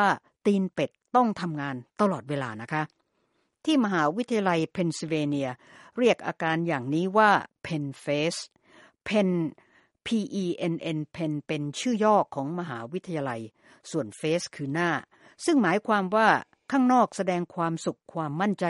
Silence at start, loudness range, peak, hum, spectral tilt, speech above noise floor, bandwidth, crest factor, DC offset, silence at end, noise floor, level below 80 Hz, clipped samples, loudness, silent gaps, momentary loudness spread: 0 s; 5 LU; -6 dBFS; none; -5.5 dB/octave; 47 dB; 11.5 kHz; 20 dB; under 0.1%; 0 s; -73 dBFS; -70 dBFS; under 0.1%; -27 LUFS; none; 12 LU